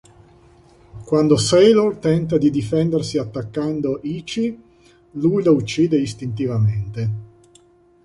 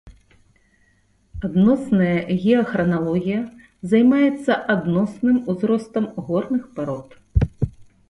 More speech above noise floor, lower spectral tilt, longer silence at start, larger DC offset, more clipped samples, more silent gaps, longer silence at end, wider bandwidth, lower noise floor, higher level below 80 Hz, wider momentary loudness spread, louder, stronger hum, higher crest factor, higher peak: second, 35 dB vs 41 dB; second, -6.5 dB/octave vs -8.5 dB/octave; first, 0.95 s vs 0.05 s; neither; neither; neither; first, 0.8 s vs 0.25 s; about the same, 11.5 kHz vs 11.5 kHz; second, -53 dBFS vs -60 dBFS; second, -48 dBFS vs -38 dBFS; about the same, 12 LU vs 11 LU; about the same, -19 LUFS vs -20 LUFS; neither; about the same, 16 dB vs 16 dB; about the same, -2 dBFS vs -4 dBFS